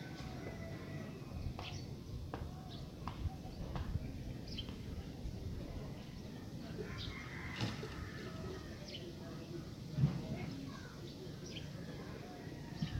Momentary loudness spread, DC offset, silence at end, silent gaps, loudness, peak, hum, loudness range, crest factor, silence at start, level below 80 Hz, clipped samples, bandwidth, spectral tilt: 7 LU; under 0.1%; 0 s; none; -46 LUFS; -20 dBFS; none; 3 LU; 24 dB; 0 s; -52 dBFS; under 0.1%; 16 kHz; -6 dB/octave